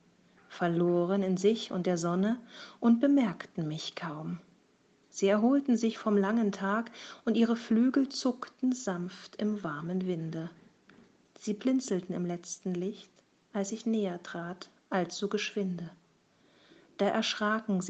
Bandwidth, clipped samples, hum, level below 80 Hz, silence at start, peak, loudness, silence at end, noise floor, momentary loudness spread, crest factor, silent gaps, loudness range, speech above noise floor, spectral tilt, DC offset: 8.6 kHz; under 0.1%; none; -76 dBFS; 0.5 s; -14 dBFS; -31 LUFS; 0 s; -67 dBFS; 14 LU; 18 dB; none; 7 LU; 37 dB; -5.5 dB/octave; under 0.1%